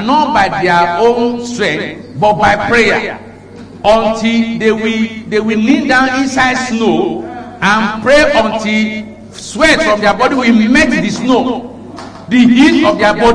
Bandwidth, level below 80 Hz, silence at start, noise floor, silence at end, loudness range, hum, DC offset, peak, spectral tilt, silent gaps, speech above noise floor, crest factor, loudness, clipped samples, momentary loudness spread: 10.5 kHz; -36 dBFS; 0 s; -32 dBFS; 0 s; 2 LU; none; under 0.1%; 0 dBFS; -4.5 dB/octave; none; 21 dB; 12 dB; -11 LUFS; under 0.1%; 14 LU